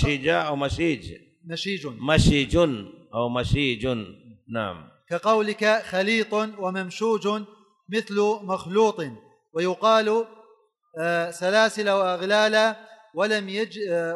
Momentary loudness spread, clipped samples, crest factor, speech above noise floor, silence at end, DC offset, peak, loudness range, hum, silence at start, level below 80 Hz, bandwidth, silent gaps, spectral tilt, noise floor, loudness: 14 LU; under 0.1%; 18 dB; 36 dB; 0 s; under 0.1%; -6 dBFS; 3 LU; none; 0 s; -42 dBFS; 12 kHz; none; -5 dB/octave; -60 dBFS; -24 LUFS